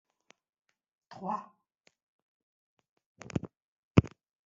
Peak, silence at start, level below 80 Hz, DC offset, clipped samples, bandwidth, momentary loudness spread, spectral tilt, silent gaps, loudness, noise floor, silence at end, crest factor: -6 dBFS; 1.1 s; -56 dBFS; under 0.1%; under 0.1%; 7.6 kHz; 24 LU; -7.5 dB/octave; 1.80-1.84 s, 2.03-2.77 s, 2.89-2.97 s, 3.06-3.15 s, 3.62-3.95 s; -33 LUFS; -72 dBFS; 0.4 s; 30 dB